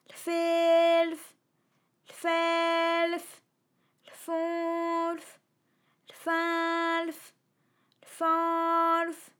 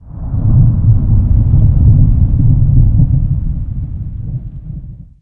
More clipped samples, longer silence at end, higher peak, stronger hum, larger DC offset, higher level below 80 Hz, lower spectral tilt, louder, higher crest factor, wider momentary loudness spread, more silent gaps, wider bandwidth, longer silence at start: neither; about the same, 0.15 s vs 0.2 s; second, -16 dBFS vs 0 dBFS; neither; neither; second, under -90 dBFS vs -14 dBFS; second, -2 dB/octave vs -14.5 dB/octave; second, -28 LUFS vs -12 LUFS; about the same, 14 dB vs 10 dB; about the same, 14 LU vs 15 LU; neither; first, 18.5 kHz vs 1.5 kHz; about the same, 0.1 s vs 0.05 s